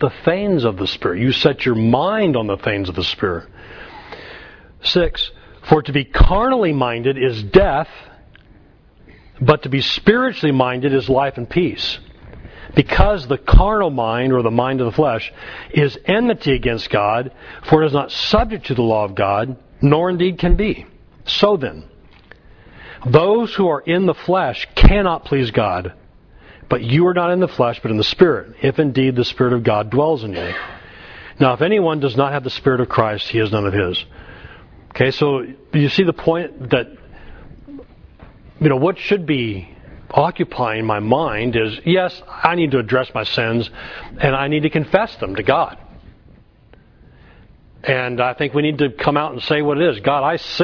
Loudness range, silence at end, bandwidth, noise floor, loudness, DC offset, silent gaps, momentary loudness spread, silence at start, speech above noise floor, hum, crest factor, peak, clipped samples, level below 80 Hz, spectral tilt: 4 LU; 0 s; 5.4 kHz; -48 dBFS; -17 LUFS; under 0.1%; none; 10 LU; 0 s; 32 dB; none; 18 dB; 0 dBFS; under 0.1%; -26 dBFS; -7.5 dB/octave